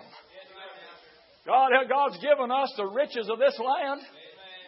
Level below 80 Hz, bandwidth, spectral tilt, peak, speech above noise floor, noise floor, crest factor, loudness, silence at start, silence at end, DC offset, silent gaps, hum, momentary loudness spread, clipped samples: -84 dBFS; 5.8 kHz; -7 dB/octave; -8 dBFS; 31 dB; -56 dBFS; 20 dB; -25 LUFS; 0.15 s; 0.05 s; under 0.1%; none; none; 23 LU; under 0.1%